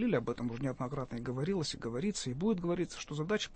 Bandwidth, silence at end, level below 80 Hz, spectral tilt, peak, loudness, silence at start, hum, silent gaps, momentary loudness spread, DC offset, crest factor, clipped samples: 8.8 kHz; 0 s; -56 dBFS; -5.5 dB/octave; -18 dBFS; -36 LUFS; 0 s; none; none; 6 LU; under 0.1%; 16 dB; under 0.1%